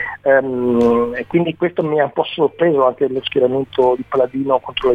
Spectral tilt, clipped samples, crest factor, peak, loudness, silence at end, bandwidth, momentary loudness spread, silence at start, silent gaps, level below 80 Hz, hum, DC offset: -7.5 dB/octave; under 0.1%; 14 dB; -2 dBFS; -17 LUFS; 0 s; 6.6 kHz; 4 LU; 0 s; none; -50 dBFS; none; under 0.1%